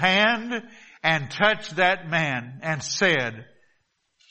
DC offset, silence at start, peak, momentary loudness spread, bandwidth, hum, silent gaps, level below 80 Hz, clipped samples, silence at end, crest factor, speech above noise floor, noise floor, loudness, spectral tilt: under 0.1%; 0 s; -4 dBFS; 9 LU; 8.4 kHz; none; none; -62 dBFS; under 0.1%; 0.9 s; 22 dB; 46 dB; -70 dBFS; -23 LUFS; -3.5 dB/octave